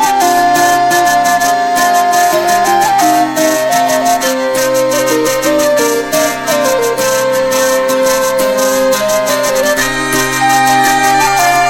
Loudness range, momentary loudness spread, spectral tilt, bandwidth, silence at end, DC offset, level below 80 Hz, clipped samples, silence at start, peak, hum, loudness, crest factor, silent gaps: 2 LU; 3 LU; -2.5 dB/octave; 17 kHz; 0 s; under 0.1%; -40 dBFS; under 0.1%; 0 s; 0 dBFS; none; -10 LUFS; 10 dB; none